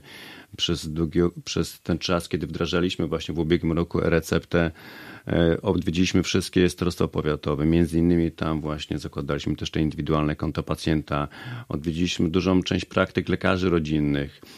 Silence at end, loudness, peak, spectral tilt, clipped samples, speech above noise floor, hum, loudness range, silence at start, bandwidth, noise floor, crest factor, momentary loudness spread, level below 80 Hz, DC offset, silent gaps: 0 s; -24 LUFS; -4 dBFS; -6 dB/octave; under 0.1%; 20 dB; none; 3 LU; 0.05 s; 14.5 kHz; -44 dBFS; 20 dB; 8 LU; -42 dBFS; under 0.1%; none